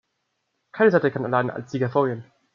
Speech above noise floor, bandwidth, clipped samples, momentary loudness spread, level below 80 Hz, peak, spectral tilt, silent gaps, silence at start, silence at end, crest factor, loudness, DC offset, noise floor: 54 dB; 7.2 kHz; under 0.1%; 12 LU; -70 dBFS; -6 dBFS; -8 dB/octave; none; 0.75 s; 0.35 s; 18 dB; -22 LUFS; under 0.1%; -76 dBFS